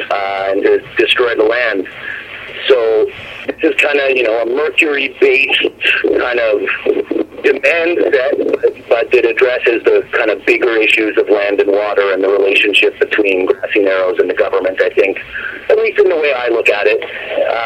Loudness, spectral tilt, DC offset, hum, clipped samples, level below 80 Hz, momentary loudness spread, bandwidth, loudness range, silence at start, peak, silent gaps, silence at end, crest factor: -12 LUFS; -3.5 dB/octave; under 0.1%; none; under 0.1%; -52 dBFS; 7 LU; 9.8 kHz; 2 LU; 0 s; 0 dBFS; none; 0 s; 12 dB